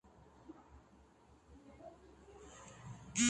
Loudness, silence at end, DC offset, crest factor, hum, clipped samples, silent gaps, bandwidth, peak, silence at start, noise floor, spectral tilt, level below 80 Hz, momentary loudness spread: -54 LUFS; 0 s; under 0.1%; 24 dB; none; under 0.1%; none; 11 kHz; -22 dBFS; 0.05 s; -65 dBFS; -2 dB/octave; -66 dBFS; 12 LU